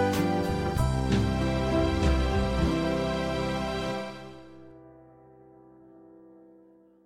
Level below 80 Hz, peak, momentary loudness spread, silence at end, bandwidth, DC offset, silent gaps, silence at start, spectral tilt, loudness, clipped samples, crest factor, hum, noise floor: -36 dBFS; -14 dBFS; 12 LU; 0.8 s; 16 kHz; under 0.1%; none; 0 s; -6.5 dB/octave; -28 LUFS; under 0.1%; 16 dB; none; -57 dBFS